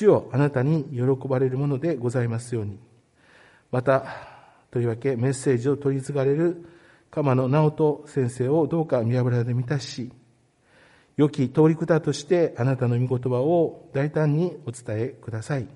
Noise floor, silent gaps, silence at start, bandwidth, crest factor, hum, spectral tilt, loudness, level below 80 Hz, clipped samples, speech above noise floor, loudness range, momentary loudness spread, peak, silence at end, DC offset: -61 dBFS; none; 0 s; 11.5 kHz; 18 dB; none; -8 dB/octave; -24 LUFS; -62 dBFS; under 0.1%; 38 dB; 4 LU; 10 LU; -6 dBFS; 0.1 s; under 0.1%